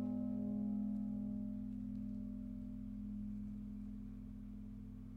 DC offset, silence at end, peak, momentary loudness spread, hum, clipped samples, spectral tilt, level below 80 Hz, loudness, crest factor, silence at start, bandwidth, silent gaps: under 0.1%; 0 s; -32 dBFS; 11 LU; none; under 0.1%; -11 dB/octave; -56 dBFS; -45 LUFS; 12 dB; 0 s; 3 kHz; none